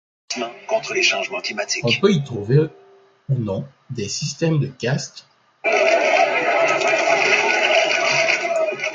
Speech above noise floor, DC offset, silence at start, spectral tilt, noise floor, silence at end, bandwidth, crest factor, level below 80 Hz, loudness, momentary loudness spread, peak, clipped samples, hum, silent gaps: 30 dB; under 0.1%; 0.3 s; -4 dB/octave; -51 dBFS; 0 s; 9 kHz; 16 dB; -60 dBFS; -19 LUFS; 11 LU; -4 dBFS; under 0.1%; none; none